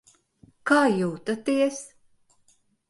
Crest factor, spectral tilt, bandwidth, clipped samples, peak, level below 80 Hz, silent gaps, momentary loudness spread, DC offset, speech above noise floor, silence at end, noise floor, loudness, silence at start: 20 dB; -5 dB/octave; 11.5 kHz; under 0.1%; -6 dBFS; -70 dBFS; none; 17 LU; under 0.1%; 41 dB; 1.05 s; -64 dBFS; -24 LUFS; 0.65 s